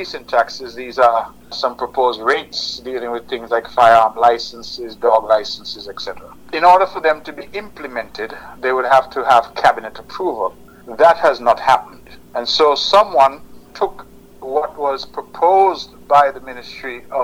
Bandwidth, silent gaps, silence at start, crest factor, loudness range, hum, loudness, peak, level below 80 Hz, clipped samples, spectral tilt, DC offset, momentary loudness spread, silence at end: 16 kHz; none; 0 s; 14 dB; 3 LU; none; -16 LUFS; -2 dBFS; -52 dBFS; under 0.1%; -3 dB/octave; under 0.1%; 17 LU; 0 s